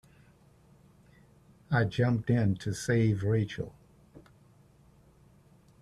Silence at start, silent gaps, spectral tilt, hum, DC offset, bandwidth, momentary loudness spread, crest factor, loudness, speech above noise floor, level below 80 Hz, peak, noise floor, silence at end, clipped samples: 1.7 s; none; -7 dB/octave; none; under 0.1%; 12 kHz; 8 LU; 18 dB; -29 LUFS; 33 dB; -60 dBFS; -14 dBFS; -60 dBFS; 1.6 s; under 0.1%